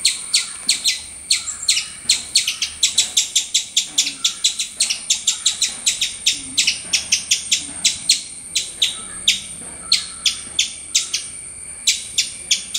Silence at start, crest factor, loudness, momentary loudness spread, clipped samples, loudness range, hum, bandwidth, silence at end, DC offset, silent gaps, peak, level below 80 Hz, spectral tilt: 0 s; 20 dB; -18 LUFS; 5 LU; under 0.1%; 2 LU; none; 16 kHz; 0 s; under 0.1%; none; 0 dBFS; -54 dBFS; 2.5 dB/octave